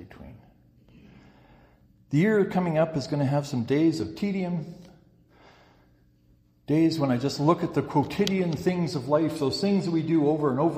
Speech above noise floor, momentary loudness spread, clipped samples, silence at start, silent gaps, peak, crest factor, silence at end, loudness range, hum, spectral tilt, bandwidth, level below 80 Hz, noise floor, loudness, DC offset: 37 dB; 6 LU; under 0.1%; 0 s; none; -8 dBFS; 20 dB; 0 s; 5 LU; none; -7 dB/octave; 15 kHz; -60 dBFS; -61 dBFS; -25 LUFS; under 0.1%